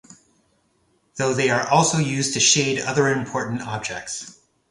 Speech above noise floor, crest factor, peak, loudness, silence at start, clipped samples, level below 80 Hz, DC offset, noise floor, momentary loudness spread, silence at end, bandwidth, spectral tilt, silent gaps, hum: 44 dB; 20 dB; -2 dBFS; -20 LUFS; 0.1 s; under 0.1%; -58 dBFS; under 0.1%; -65 dBFS; 15 LU; 0.4 s; 11.5 kHz; -3 dB/octave; none; none